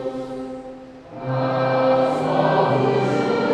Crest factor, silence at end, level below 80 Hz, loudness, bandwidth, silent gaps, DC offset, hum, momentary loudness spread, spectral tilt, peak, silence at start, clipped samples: 14 dB; 0 s; -56 dBFS; -20 LUFS; 10 kHz; none; under 0.1%; none; 17 LU; -7.5 dB/octave; -6 dBFS; 0 s; under 0.1%